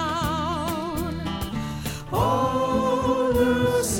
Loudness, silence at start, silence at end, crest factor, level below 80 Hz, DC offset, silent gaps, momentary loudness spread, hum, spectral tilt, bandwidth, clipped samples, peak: -24 LUFS; 0 s; 0 s; 14 dB; -40 dBFS; under 0.1%; none; 9 LU; none; -5 dB/octave; 17 kHz; under 0.1%; -10 dBFS